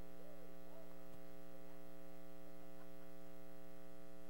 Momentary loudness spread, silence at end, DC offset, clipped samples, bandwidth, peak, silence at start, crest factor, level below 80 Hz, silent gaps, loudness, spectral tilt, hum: 1 LU; 0 s; 0.7%; under 0.1%; 16 kHz; -38 dBFS; 0 s; 14 dB; -76 dBFS; none; -60 LUFS; -6 dB/octave; none